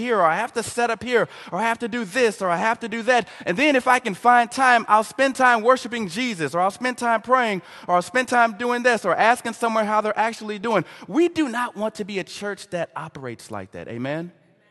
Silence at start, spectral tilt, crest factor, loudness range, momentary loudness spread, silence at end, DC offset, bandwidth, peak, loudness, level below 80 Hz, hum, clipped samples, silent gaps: 0 s; -4 dB/octave; 20 dB; 7 LU; 12 LU; 0.4 s; under 0.1%; 12.5 kHz; -2 dBFS; -21 LUFS; -64 dBFS; none; under 0.1%; none